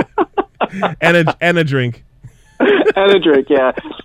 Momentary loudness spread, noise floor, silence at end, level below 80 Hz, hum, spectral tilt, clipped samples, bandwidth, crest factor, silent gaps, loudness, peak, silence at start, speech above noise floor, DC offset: 8 LU; -42 dBFS; 0.05 s; -48 dBFS; none; -6.5 dB/octave; under 0.1%; 12 kHz; 14 dB; none; -14 LUFS; 0 dBFS; 0 s; 29 dB; under 0.1%